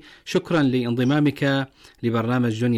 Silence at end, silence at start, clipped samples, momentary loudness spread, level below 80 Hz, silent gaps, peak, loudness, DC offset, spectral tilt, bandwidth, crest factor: 0 s; 0.25 s; under 0.1%; 6 LU; -58 dBFS; none; -12 dBFS; -22 LUFS; under 0.1%; -7 dB/octave; 14.5 kHz; 10 dB